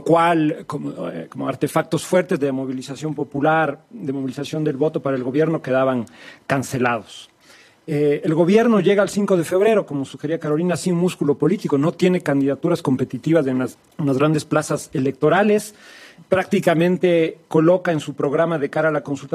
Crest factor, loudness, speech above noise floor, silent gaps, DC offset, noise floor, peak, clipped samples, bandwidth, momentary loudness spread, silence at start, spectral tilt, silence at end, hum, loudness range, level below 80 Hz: 18 dB; -20 LUFS; 31 dB; none; under 0.1%; -50 dBFS; -2 dBFS; under 0.1%; 15 kHz; 11 LU; 0 s; -6.5 dB/octave; 0.05 s; none; 4 LU; -64 dBFS